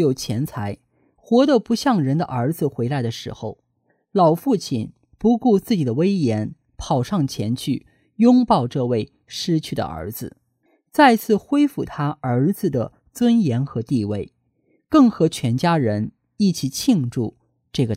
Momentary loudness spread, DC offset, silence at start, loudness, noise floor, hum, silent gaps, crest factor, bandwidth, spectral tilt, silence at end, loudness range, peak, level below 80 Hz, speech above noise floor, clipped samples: 14 LU; under 0.1%; 0 s; -20 LUFS; -67 dBFS; none; none; 18 dB; 16 kHz; -6.5 dB/octave; 0 s; 2 LU; -2 dBFS; -52 dBFS; 48 dB; under 0.1%